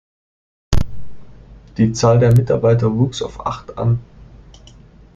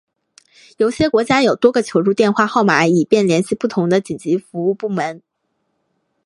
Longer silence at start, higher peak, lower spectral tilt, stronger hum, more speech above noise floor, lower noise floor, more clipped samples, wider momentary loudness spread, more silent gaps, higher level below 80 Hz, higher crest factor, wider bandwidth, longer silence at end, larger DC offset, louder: about the same, 0.7 s vs 0.8 s; about the same, -2 dBFS vs 0 dBFS; first, -7 dB/octave vs -5.5 dB/octave; neither; second, 28 dB vs 54 dB; second, -43 dBFS vs -70 dBFS; neither; first, 13 LU vs 7 LU; neither; first, -32 dBFS vs -54 dBFS; about the same, 16 dB vs 16 dB; second, 7.8 kHz vs 11.5 kHz; second, 0.9 s vs 1.1 s; neither; about the same, -17 LUFS vs -16 LUFS